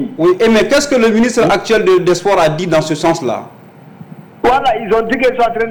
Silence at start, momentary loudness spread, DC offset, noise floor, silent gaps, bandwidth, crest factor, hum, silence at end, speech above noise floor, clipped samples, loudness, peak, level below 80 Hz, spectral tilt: 0 s; 4 LU; under 0.1%; -36 dBFS; none; 19 kHz; 8 dB; none; 0 s; 24 dB; under 0.1%; -12 LUFS; -6 dBFS; -40 dBFS; -5 dB/octave